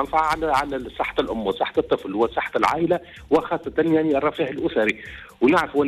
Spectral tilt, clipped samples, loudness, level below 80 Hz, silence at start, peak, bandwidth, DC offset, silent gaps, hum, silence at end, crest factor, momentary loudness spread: -6 dB/octave; under 0.1%; -22 LUFS; -48 dBFS; 0 s; -8 dBFS; 13.5 kHz; under 0.1%; none; none; 0 s; 14 dB; 6 LU